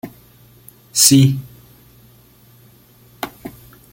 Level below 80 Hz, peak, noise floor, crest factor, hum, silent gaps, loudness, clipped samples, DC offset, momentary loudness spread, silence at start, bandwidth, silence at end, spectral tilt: -52 dBFS; 0 dBFS; -48 dBFS; 20 dB; none; none; -13 LUFS; under 0.1%; under 0.1%; 27 LU; 0.05 s; 17 kHz; 0.45 s; -3.5 dB/octave